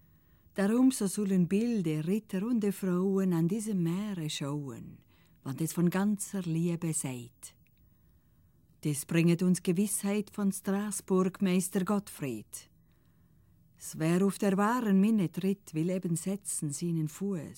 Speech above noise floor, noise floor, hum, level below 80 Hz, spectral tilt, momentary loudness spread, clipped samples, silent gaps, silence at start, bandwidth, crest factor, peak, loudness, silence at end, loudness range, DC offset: 35 dB; -65 dBFS; none; -70 dBFS; -6 dB/octave; 13 LU; under 0.1%; none; 0.55 s; 17 kHz; 16 dB; -14 dBFS; -31 LUFS; 0.05 s; 4 LU; under 0.1%